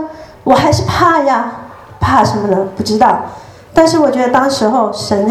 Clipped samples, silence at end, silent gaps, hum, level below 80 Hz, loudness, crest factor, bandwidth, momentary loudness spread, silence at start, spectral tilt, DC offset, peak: 0.2%; 0 s; none; none; -38 dBFS; -12 LUFS; 12 dB; 15 kHz; 9 LU; 0 s; -5.5 dB/octave; under 0.1%; 0 dBFS